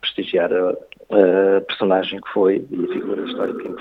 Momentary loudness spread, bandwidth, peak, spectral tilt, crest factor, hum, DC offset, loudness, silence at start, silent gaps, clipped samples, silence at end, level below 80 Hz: 10 LU; 5 kHz; 0 dBFS; -7.5 dB/octave; 18 dB; none; under 0.1%; -19 LUFS; 0.05 s; none; under 0.1%; 0 s; -64 dBFS